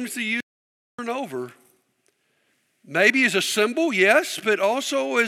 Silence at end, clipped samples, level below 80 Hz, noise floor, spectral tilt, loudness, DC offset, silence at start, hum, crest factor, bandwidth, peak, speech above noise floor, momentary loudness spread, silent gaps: 0 s; under 0.1%; -86 dBFS; -69 dBFS; -2.5 dB/octave; -21 LUFS; under 0.1%; 0 s; none; 20 dB; 16.5 kHz; -4 dBFS; 47 dB; 14 LU; 0.43-0.98 s